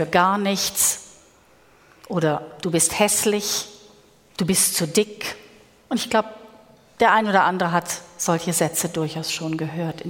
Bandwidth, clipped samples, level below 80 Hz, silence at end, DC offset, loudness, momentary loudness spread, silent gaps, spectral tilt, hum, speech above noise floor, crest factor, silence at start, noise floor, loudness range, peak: 18 kHz; under 0.1%; -58 dBFS; 0 s; under 0.1%; -21 LUFS; 11 LU; none; -3 dB/octave; none; 33 dB; 20 dB; 0 s; -54 dBFS; 2 LU; -2 dBFS